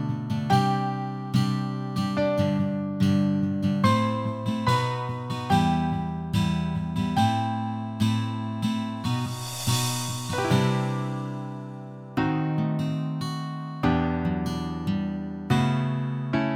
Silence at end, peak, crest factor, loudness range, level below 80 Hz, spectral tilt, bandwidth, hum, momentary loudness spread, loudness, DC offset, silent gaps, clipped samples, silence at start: 0 s; -8 dBFS; 18 dB; 3 LU; -50 dBFS; -6 dB/octave; 16.5 kHz; none; 8 LU; -26 LUFS; under 0.1%; none; under 0.1%; 0 s